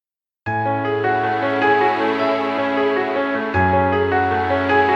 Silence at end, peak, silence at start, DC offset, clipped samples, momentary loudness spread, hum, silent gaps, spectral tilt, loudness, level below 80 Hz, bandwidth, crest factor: 0 s; -4 dBFS; 0.45 s; under 0.1%; under 0.1%; 4 LU; none; none; -7.5 dB/octave; -18 LUFS; -50 dBFS; 7.6 kHz; 14 dB